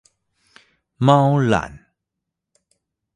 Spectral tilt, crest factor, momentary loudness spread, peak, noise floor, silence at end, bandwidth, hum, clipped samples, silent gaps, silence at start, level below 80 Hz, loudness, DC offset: -7.5 dB/octave; 22 dB; 9 LU; 0 dBFS; -82 dBFS; 1.4 s; 9.6 kHz; none; under 0.1%; none; 1 s; -50 dBFS; -17 LUFS; under 0.1%